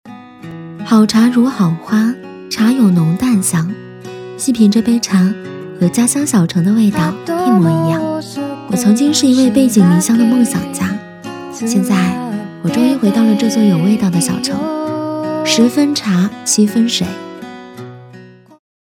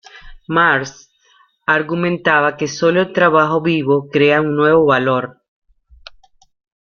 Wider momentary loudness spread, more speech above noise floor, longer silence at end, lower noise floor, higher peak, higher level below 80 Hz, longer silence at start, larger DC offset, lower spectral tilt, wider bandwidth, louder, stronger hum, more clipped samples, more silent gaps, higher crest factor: first, 17 LU vs 7 LU; second, 26 dB vs 40 dB; second, 0.55 s vs 1.55 s; second, -38 dBFS vs -55 dBFS; about the same, 0 dBFS vs -2 dBFS; about the same, -52 dBFS vs -50 dBFS; about the same, 0.05 s vs 0.15 s; neither; about the same, -5 dB/octave vs -5.5 dB/octave; first, 17 kHz vs 7 kHz; about the same, -13 LUFS vs -15 LUFS; neither; neither; neither; about the same, 14 dB vs 16 dB